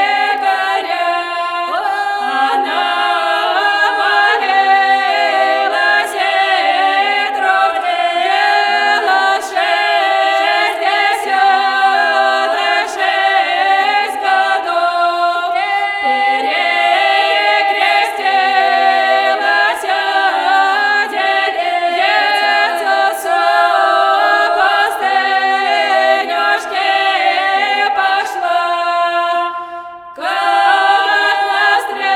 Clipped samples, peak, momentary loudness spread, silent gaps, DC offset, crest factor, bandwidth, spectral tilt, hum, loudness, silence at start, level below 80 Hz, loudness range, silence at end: under 0.1%; 0 dBFS; 4 LU; none; under 0.1%; 14 dB; 14.5 kHz; 0 dB/octave; none; -13 LUFS; 0 s; -64 dBFS; 2 LU; 0 s